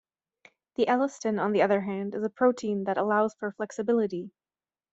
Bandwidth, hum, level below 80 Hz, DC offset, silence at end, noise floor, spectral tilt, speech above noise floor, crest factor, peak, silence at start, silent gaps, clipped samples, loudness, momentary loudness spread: 8 kHz; none; -74 dBFS; under 0.1%; 0.65 s; under -90 dBFS; -6 dB/octave; over 63 dB; 18 dB; -10 dBFS; 0.8 s; none; under 0.1%; -27 LUFS; 9 LU